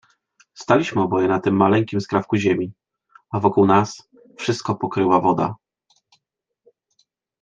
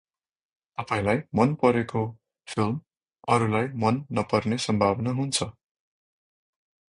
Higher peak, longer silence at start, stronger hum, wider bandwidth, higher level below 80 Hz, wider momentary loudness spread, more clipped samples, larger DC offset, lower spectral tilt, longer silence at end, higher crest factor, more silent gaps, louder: first, -2 dBFS vs -6 dBFS; second, 0.6 s vs 0.8 s; neither; second, 7.8 kHz vs 11 kHz; second, -64 dBFS vs -56 dBFS; about the same, 12 LU vs 11 LU; neither; neither; about the same, -6.5 dB/octave vs -5.5 dB/octave; first, 1.85 s vs 1.4 s; about the same, 20 dB vs 22 dB; neither; first, -20 LUFS vs -26 LUFS